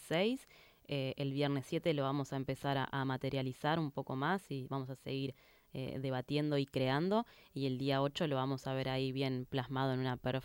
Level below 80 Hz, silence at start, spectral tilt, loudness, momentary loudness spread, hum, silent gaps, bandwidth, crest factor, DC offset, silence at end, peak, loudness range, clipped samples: -68 dBFS; 0 s; -6.5 dB/octave; -37 LUFS; 7 LU; none; none; 16.5 kHz; 16 dB; under 0.1%; 0 s; -20 dBFS; 3 LU; under 0.1%